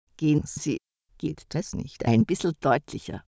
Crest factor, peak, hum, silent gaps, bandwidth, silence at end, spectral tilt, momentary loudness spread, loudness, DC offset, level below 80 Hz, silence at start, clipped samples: 18 dB; -8 dBFS; none; none; 8 kHz; 0.1 s; -6.5 dB/octave; 12 LU; -27 LUFS; under 0.1%; -50 dBFS; 0.2 s; under 0.1%